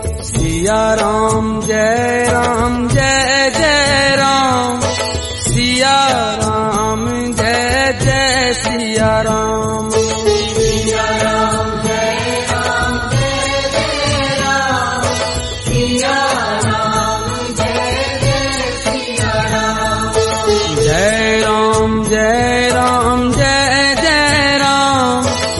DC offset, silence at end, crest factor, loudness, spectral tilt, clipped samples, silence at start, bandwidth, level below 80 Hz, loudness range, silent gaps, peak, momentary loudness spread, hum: under 0.1%; 0 s; 14 dB; -13 LUFS; -3.5 dB/octave; under 0.1%; 0 s; 11.5 kHz; -30 dBFS; 3 LU; none; 0 dBFS; 6 LU; none